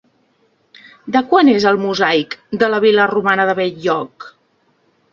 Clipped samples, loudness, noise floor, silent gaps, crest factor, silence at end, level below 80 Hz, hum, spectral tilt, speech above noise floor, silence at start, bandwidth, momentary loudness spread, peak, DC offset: under 0.1%; -15 LUFS; -60 dBFS; none; 16 dB; 0.85 s; -60 dBFS; none; -5.5 dB/octave; 45 dB; 1.05 s; 7.4 kHz; 9 LU; 0 dBFS; under 0.1%